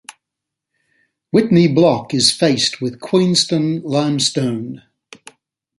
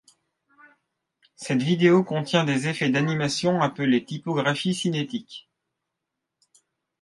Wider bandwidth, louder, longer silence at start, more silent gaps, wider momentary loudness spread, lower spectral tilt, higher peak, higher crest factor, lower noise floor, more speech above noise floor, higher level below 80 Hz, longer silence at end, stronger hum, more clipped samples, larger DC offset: about the same, 11.5 kHz vs 11.5 kHz; first, -15 LUFS vs -23 LUFS; second, 0.1 s vs 1.4 s; neither; about the same, 10 LU vs 12 LU; about the same, -4.5 dB/octave vs -5.5 dB/octave; first, 0 dBFS vs -6 dBFS; about the same, 18 dB vs 20 dB; about the same, -82 dBFS vs -83 dBFS; first, 67 dB vs 60 dB; first, -58 dBFS vs -68 dBFS; second, 1 s vs 1.6 s; neither; neither; neither